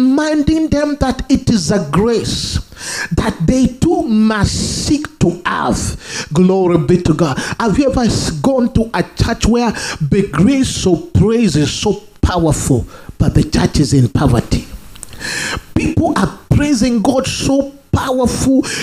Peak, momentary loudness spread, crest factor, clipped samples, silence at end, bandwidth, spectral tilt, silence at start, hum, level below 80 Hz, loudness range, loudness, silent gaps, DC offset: 0 dBFS; 6 LU; 14 dB; under 0.1%; 0 s; 15.5 kHz; -5.5 dB/octave; 0 s; none; -28 dBFS; 1 LU; -14 LUFS; none; under 0.1%